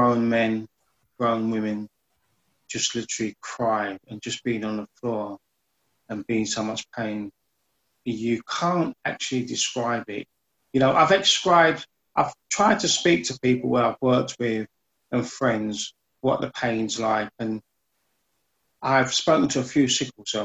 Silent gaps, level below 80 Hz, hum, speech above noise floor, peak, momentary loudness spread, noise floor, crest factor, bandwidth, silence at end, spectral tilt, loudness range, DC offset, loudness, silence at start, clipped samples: none; -62 dBFS; none; 50 dB; -6 dBFS; 14 LU; -74 dBFS; 20 dB; 9 kHz; 0 s; -3.5 dB/octave; 9 LU; under 0.1%; -24 LUFS; 0 s; under 0.1%